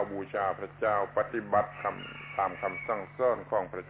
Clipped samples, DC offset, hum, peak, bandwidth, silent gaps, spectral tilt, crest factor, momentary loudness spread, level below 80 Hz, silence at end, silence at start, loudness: under 0.1%; under 0.1%; none; -14 dBFS; 4 kHz; none; -4 dB/octave; 18 dB; 7 LU; -62 dBFS; 0 s; 0 s; -32 LUFS